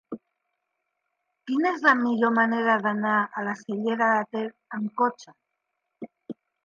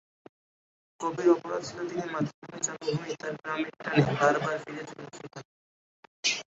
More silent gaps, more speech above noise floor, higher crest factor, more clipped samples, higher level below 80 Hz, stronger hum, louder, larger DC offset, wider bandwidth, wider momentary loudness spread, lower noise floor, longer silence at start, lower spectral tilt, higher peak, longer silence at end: second, none vs 2.34-2.42 s, 5.45-6.23 s; second, 56 dB vs over 60 dB; about the same, 20 dB vs 22 dB; neither; second, -80 dBFS vs -68 dBFS; neither; first, -24 LUFS vs -30 LUFS; neither; second, 7.2 kHz vs 8 kHz; first, 22 LU vs 17 LU; second, -81 dBFS vs under -90 dBFS; second, 0.1 s vs 1 s; first, -6 dB/octave vs -4.5 dB/octave; about the same, -6 dBFS vs -8 dBFS; first, 0.3 s vs 0.15 s